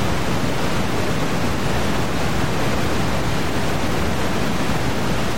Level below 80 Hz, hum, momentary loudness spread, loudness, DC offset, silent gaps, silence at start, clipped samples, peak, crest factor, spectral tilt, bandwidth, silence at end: -32 dBFS; none; 1 LU; -22 LUFS; 9%; none; 0 s; under 0.1%; -6 dBFS; 14 dB; -5 dB/octave; 16.5 kHz; 0 s